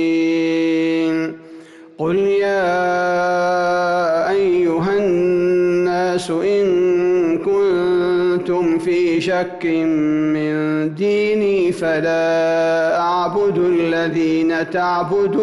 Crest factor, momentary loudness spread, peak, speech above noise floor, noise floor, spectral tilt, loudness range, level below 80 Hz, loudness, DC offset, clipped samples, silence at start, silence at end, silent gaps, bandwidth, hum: 8 dB; 3 LU; -8 dBFS; 22 dB; -39 dBFS; -6.5 dB/octave; 2 LU; -54 dBFS; -17 LUFS; under 0.1%; under 0.1%; 0 s; 0 s; none; 11.5 kHz; none